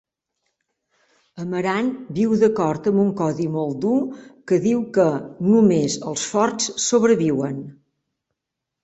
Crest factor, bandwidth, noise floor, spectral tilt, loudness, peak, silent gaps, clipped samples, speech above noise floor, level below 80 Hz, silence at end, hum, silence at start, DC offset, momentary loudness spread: 16 dB; 8.2 kHz; -83 dBFS; -5.5 dB/octave; -20 LUFS; -4 dBFS; none; under 0.1%; 63 dB; -62 dBFS; 1.1 s; none; 1.35 s; under 0.1%; 10 LU